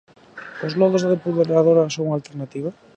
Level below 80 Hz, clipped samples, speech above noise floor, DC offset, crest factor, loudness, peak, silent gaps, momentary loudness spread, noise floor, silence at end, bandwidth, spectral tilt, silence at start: -68 dBFS; under 0.1%; 21 dB; under 0.1%; 16 dB; -20 LUFS; -4 dBFS; none; 15 LU; -40 dBFS; 0.25 s; 8.4 kHz; -6.5 dB/octave; 0.35 s